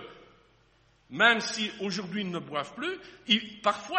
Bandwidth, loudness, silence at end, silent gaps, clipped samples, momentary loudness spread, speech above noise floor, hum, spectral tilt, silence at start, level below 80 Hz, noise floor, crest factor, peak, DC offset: 8.4 kHz; -28 LUFS; 0 s; none; under 0.1%; 14 LU; 35 dB; 50 Hz at -70 dBFS; -3 dB/octave; 0 s; -70 dBFS; -64 dBFS; 24 dB; -6 dBFS; under 0.1%